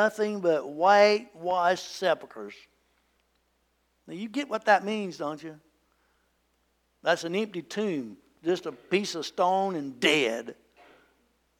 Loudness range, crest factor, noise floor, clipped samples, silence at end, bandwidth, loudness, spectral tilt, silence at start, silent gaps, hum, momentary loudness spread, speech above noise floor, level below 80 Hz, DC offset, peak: 7 LU; 20 dB; -72 dBFS; under 0.1%; 1.05 s; 16.5 kHz; -27 LUFS; -4 dB/octave; 0 s; none; none; 17 LU; 45 dB; -76 dBFS; under 0.1%; -8 dBFS